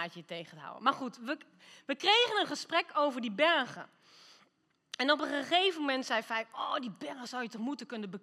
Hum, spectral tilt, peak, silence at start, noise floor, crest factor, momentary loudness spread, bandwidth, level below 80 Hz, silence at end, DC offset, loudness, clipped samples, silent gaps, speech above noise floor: none; -3 dB/octave; -12 dBFS; 0 s; -74 dBFS; 22 dB; 16 LU; 14 kHz; under -90 dBFS; 0.05 s; under 0.1%; -32 LUFS; under 0.1%; none; 40 dB